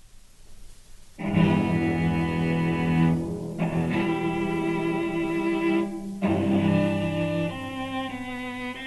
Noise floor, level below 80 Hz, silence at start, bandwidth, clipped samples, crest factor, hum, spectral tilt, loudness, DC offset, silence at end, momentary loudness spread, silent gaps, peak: -47 dBFS; -48 dBFS; 0.05 s; 12 kHz; under 0.1%; 16 dB; none; -7.5 dB/octave; -26 LUFS; under 0.1%; 0 s; 9 LU; none; -10 dBFS